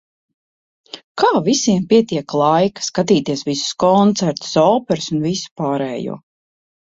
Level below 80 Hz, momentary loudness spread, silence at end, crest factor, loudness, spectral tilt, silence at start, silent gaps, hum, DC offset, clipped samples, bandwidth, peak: -56 dBFS; 11 LU; 0.75 s; 16 dB; -17 LUFS; -5 dB/octave; 0.95 s; 1.04-1.15 s, 5.51-5.56 s; none; under 0.1%; under 0.1%; 8 kHz; -2 dBFS